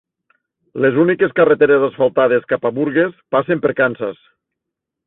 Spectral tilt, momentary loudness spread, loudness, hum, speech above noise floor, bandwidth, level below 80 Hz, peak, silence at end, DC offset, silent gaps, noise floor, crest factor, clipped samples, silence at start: -11.5 dB/octave; 7 LU; -16 LUFS; none; 66 dB; 4 kHz; -60 dBFS; -2 dBFS; 0.95 s; under 0.1%; none; -81 dBFS; 14 dB; under 0.1%; 0.75 s